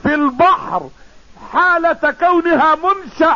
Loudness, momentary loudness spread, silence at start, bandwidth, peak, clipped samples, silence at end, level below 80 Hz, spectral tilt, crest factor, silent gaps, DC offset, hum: -14 LUFS; 7 LU; 0 s; 7.2 kHz; -4 dBFS; under 0.1%; 0 s; -46 dBFS; -6 dB/octave; 12 dB; none; 0.6%; none